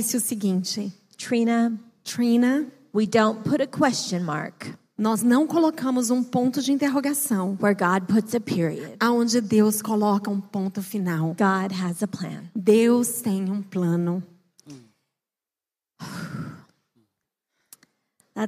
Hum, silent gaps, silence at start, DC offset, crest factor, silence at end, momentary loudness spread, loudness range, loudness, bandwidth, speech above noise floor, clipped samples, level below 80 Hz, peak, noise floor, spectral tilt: none; none; 0 s; under 0.1%; 18 dB; 0 s; 13 LU; 11 LU; -23 LUFS; 15.5 kHz; over 67 dB; under 0.1%; -74 dBFS; -6 dBFS; under -90 dBFS; -5 dB/octave